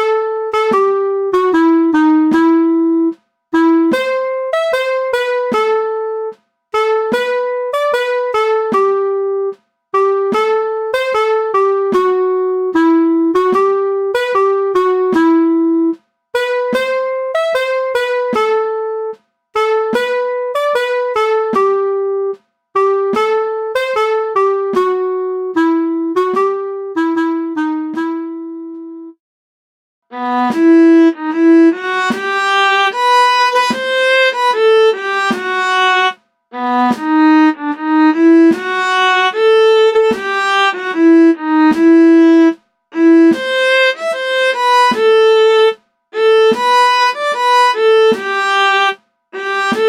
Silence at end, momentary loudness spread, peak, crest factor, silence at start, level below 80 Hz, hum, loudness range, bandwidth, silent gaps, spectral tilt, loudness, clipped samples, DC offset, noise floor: 0 s; 10 LU; -2 dBFS; 10 dB; 0 s; -62 dBFS; none; 6 LU; 12 kHz; 29.20-30.02 s; -4 dB/octave; -13 LUFS; under 0.1%; under 0.1%; under -90 dBFS